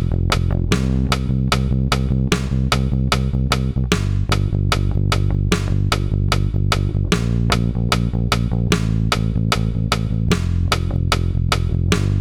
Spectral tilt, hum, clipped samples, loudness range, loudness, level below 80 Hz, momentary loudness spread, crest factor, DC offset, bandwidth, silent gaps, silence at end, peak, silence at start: -5.5 dB/octave; none; under 0.1%; 0 LU; -19 LUFS; -24 dBFS; 1 LU; 16 dB; under 0.1%; 18.5 kHz; none; 0 s; -2 dBFS; 0 s